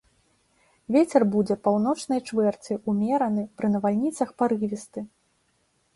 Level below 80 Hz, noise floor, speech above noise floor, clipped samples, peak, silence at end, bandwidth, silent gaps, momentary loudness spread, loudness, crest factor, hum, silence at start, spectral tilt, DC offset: -66 dBFS; -69 dBFS; 45 dB; under 0.1%; -6 dBFS; 0.9 s; 11.5 kHz; none; 10 LU; -25 LUFS; 20 dB; none; 0.9 s; -7 dB/octave; under 0.1%